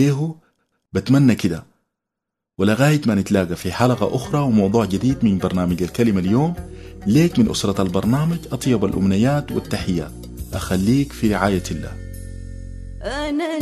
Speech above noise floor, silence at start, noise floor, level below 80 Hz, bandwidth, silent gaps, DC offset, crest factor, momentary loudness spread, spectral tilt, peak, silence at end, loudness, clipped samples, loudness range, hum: 65 dB; 0 s; -83 dBFS; -38 dBFS; 13.5 kHz; none; under 0.1%; 18 dB; 16 LU; -6.5 dB/octave; -2 dBFS; 0 s; -19 LUFS; under 0.1%; 4 LU; none